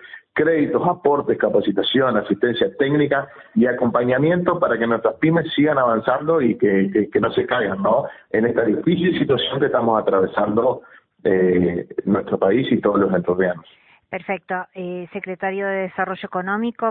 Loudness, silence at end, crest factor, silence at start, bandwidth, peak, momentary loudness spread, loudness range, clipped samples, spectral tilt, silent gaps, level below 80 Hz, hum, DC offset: -19 LUFS; 0 s; 16 dB; 0 s; 4.3 kHz; -2 dBFS; 8 LU; 4 LU; under 0.1%; -11.5 dB/octave; none; -56 dBFS; none; under 0.1%